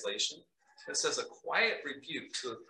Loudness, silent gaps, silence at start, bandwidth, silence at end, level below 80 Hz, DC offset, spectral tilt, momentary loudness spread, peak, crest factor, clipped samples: -34 LUFS; none; 0 s; 12 kHz; 0.05 s; -88 dBFS; under 0.1%; 0 dB/octave; 11 LU; -16 dBFS; 20 dB; under 0.1%